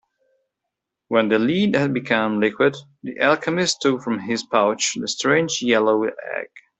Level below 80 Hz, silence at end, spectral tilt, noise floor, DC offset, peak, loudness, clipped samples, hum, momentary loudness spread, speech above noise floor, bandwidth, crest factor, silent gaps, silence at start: -64 dBFS; 0.2 s; -4 dB/octave; -82 dBFS; under 0.1%; -2 dBFS; -20 LUFS; under 0.1%; none; 7 LU; 62 dB; 8.4 kHz; 18 dB; none; 1.1 s